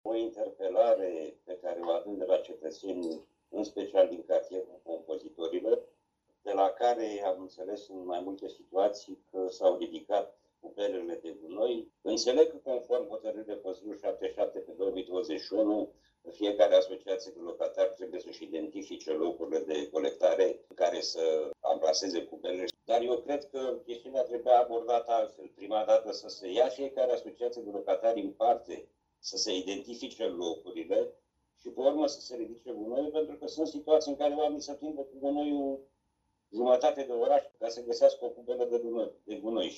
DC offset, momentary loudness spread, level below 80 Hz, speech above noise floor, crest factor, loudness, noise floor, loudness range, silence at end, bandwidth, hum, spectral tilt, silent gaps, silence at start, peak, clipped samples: under 0.1%; 14 LU; -74 dBFS; 48 dB; 22 dB; -32 LUFS; -78 dBFS; 4 LU; 0 s; 8 kHz; none; -3 dB/octave; none; 0.05 s; -10 dBFS; under 0.1%